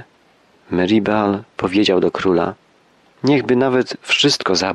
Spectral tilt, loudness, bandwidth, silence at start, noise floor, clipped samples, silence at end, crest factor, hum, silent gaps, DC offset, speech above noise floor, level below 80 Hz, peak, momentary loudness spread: -4.5 dB/octave; -17 LUFS; 12 kHz; 0 s; -54 dBFS; under 0.1%; 0 s; 14 dB; none; none; under 0.1%; 38 dB; -54 dBFS; -2 dBFS; 7 LU